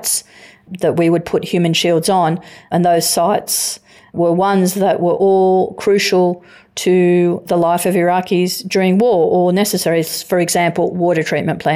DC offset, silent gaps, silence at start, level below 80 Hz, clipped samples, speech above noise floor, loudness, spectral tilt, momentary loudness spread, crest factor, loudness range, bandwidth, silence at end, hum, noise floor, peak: under 0.1%; none; 0 s; -58 dBFS; under 0.1%; 28 dB; -15 LUFS; -4.5 dB/octave; 6 LU; 10 dB; 1 LU; 16.5 kHz; 0 s; none; -43 dBFS; -4 dBFS